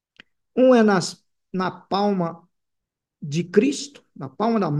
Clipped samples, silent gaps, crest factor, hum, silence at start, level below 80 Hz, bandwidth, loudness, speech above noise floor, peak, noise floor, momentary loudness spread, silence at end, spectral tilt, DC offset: under 0.1%; none; 18 dB; none; 0.55 s; -70 dBFS; 11.5 kHz; -21 LUFS; 61 dB; -4 dBFS; -82 dBFS; 19 LU; 0 s; -6 dB/octave; under 0.1%